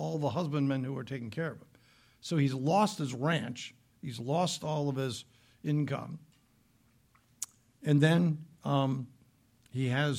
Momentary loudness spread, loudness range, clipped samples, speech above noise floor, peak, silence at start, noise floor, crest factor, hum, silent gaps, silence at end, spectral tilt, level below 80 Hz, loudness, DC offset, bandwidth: 15 LU; 4 LU; under 0.1%; 37 dB; -12 dBFS; 0 s; -67 dBFS; 20 dB; none; none; 0 s; -6 dB/octave; -72 dBFS; -32 LUFS; under 0.1%; 15.5 kHz